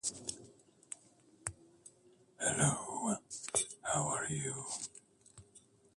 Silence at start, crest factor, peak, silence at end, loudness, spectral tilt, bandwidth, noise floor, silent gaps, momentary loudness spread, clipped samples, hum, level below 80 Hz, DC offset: 0.05 s; 24 dB; -16 dBFS; 0.35 s; -37 LUFS; -3 dB/octave; 11.5 kHz; -66 dBFS; none; 21 LU; under 0.1%; none; -68 dBFS; under 0.1%